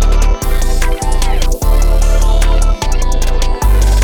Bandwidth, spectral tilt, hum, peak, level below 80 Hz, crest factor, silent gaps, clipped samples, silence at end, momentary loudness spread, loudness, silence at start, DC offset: 17.5 kHz; -4.5 dB/octave; none; -2 dBFS; -10 dBFS; 8 dB; none; under 0.1%; 0 s; 3 LU; -15 LUFS; 0 s; under 0.1%